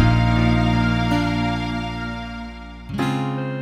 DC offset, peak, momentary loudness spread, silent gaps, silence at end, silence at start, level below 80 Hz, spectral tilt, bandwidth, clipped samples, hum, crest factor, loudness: under 0.1%; -4 dBFS; 14 LU; none; 0 s; 0 s; -30 dBFS; -7 dB/octave; 10.5 kHz; under 0.1%; none; 16 dB; -21 LUFS